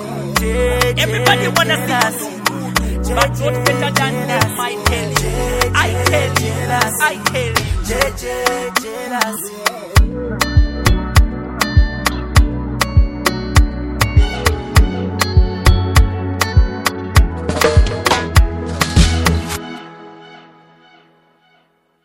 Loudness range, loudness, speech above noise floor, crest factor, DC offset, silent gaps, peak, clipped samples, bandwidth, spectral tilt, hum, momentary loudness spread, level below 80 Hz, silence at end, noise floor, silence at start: 2 LU; -16 LUFS; 41 dB; 16 dB; under 0.1%; none; 0 dBFS; under 0.1%; 17 kHz; -4.5 dB/octave; none; 6 LU; -20 dBFS; 1.65 s; -58 dBFS; 0 s